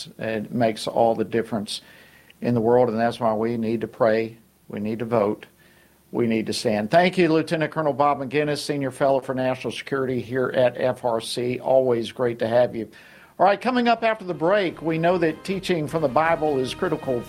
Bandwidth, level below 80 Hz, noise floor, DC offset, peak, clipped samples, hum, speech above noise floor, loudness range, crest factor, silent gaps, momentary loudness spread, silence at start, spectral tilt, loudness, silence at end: 16 kHz; -58 dBFS; -55 dBFS; under 0.1%; -4 dBFS; under 0.1%; none; 33 dB; 2 LU; 20 dB; none; 9 LU; 0 s; -6 dB/octave; -23 LUFS; 0 s